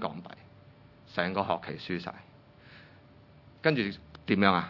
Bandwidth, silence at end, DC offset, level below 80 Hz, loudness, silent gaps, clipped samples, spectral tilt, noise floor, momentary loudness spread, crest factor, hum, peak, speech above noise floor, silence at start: 6 kHz; 0 s; under 0.1%; -66 dBFS; -31 LUFS; none; under 0.1%; -8 dB/octave; -56 dBFS; 25 LU; 28 dB; none; -6 dBFS; 27 dB; 0 s